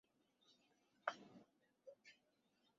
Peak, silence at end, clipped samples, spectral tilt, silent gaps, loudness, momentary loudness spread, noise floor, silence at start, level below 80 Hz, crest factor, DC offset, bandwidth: -22 dBFS; 0.65 s; under 0.1%; -0.5 dB/octave; none; -52 LUFS; 18 LU; -82 dBFS; 0.45 s; under -90 dBFS; 36 dB; under 0.1%; 7.4 kHz